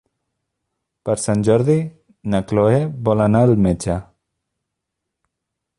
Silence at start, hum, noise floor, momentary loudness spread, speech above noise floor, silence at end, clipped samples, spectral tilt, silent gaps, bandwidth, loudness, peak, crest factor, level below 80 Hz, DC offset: 1.05 s; none; -80 dBFS; 12 LU; 64 dB; 1.75 s; under 0.1%; -7.5 dB/octave; none; 11.5 kHz; -18 LUFS; -2 dBFS; 16 dB; -42 dBFS; under 0.1%